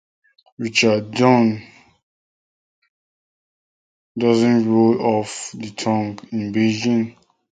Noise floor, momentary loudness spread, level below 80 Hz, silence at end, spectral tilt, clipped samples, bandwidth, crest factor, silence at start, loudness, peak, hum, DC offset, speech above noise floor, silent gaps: under -90 dBFS; 14 LU; -60 dBFS; 0.45 s; -5.5 dB/octave; under 0.1%; 9.4 kHz; 20 dB; 0.6 s; -19 LUFS; 0 dBFS; none; under 0.1%; over 72 dB; 2.03-2.82 s, 2.89-4.15 s